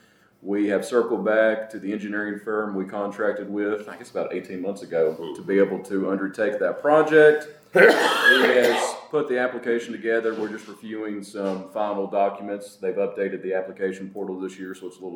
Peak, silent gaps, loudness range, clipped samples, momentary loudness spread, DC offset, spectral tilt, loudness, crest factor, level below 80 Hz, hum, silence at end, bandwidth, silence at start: -2 dBFS; none; 10 LU; under 0.1%; 16 LU; under 0.1%; -4.5 dB/octave; -23 LUFS; 22 dB; -78 dBFS; none; 0 s; 18 kHz; 0.45 s